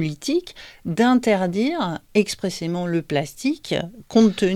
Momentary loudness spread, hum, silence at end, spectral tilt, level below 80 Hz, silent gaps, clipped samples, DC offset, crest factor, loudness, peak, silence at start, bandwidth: 9 LU; none; 0 s; -5.5 dB/octave; -54 dBFS; none; under 0.1%; under 0.1%; 18 dB; -22 LUFS; -4 dBFS; 0 s; 14 kHz